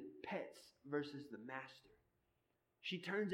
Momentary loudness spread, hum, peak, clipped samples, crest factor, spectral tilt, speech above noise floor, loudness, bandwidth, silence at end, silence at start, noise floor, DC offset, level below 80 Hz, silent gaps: 14 LU; none; -30 dBFS; under 0.1%; 18 dB; -5.5 dB/octave; 39 dB; -48 LUFS; 16.5 kHz; 0 s; 0 s; -85 dBFS; under 0.1%; -88 dBFS; none